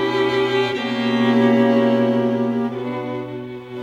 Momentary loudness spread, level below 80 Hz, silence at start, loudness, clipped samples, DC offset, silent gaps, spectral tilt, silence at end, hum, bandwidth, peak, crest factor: 13 LU; -60 dBFS; 0 s; -19 LUFS; under 0.1%; under 0.1%; none; -6.5 dB/octave; 0 s; none; 8 kHz; -4 dBFS; 14 dB